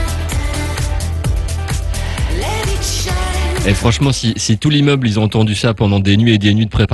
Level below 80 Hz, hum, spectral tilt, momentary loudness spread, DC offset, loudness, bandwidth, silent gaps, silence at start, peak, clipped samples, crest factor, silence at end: -22 dBFS; none; -5 dB/octave; 8 LU; under 0.1%; -15 LUFS; 12.5 kHz; none; 0 s; 0 dBFS; under 0.1%; 14 dB; 0 s